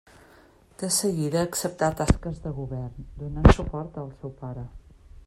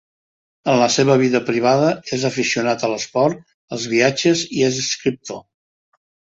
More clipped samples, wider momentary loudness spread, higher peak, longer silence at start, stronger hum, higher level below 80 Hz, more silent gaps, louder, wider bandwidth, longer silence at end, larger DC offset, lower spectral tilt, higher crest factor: neither; first, 19 LU vs 13 LU; about the same, -2 dBFS vs -2 dBFS; first, 0.8 s vs 0.65 s; neither; first, -32 dBFS vs -60 dBFS; second, none vs 3.54-3.68 s; second, -25 LUFS vs -18 LUFS; first, 16 kHz vs 8 kHz; second, 0.1 s vs 1 s; neither; first, -5.5 dB/octave vs -4 dB/octave; first, 24 dB vs 18 dB